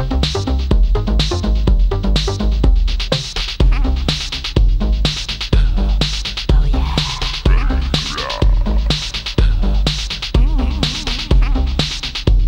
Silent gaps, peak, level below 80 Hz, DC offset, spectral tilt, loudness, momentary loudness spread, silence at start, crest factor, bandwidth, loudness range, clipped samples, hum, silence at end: none; 0 dBFS; -16 dBFS; under 0.1%; -5 dB/octave; -18 LUFS; 3 LU; 0 s; 14 dB; 9.2 kHz; 1 LU; under 0.1%; none; 0 s